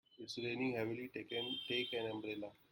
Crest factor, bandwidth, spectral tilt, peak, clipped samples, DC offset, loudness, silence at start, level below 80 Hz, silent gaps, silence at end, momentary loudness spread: 16 dB; 16.5 kHz; -5 dB/octave; -26 dBFS; under 0.1%; under 0.1%; -42 LUFS; 0.15 s; -80 dBFS; none; 0.2 s; 7 LU